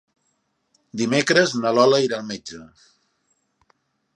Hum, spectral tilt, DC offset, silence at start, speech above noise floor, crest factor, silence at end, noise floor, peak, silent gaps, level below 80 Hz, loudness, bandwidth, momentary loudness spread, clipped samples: none; -4 dB/octave; under 0.1%; 0.95 s; 51 dB; 22 dB; 1.5 s; -71 dBFS; -2 dBFS; none; -68 dBFS; -19 LUFS; 11.5 kHz; 20 LU; under 0.1%